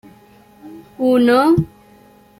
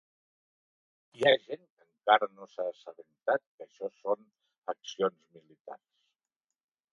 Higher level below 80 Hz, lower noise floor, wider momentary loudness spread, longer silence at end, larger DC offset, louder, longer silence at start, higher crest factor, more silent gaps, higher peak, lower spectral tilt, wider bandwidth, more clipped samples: first, -48 dBFS vs -84 dBFS; second, -48 dBFS vs under -90 dBFS; second, 9 LU vs 24 LU; second, 0.75 s vs 1.15 s; neither; first, -15 LUFS vs -31 LUFS; second, 0.65 s vs 1.2 s; second, 16 dB vs 26 dB; second, none vs 1.70-1.77 s, 3.47-3.58 s, 4.58-4.62 s, 5.61-5.65 s; first, -2 dBFS vs -8 dBFS; first, -7.5 dB/octave vs -3.5 dB/octave; first, 15 kHz vs 10.5 kHz; neither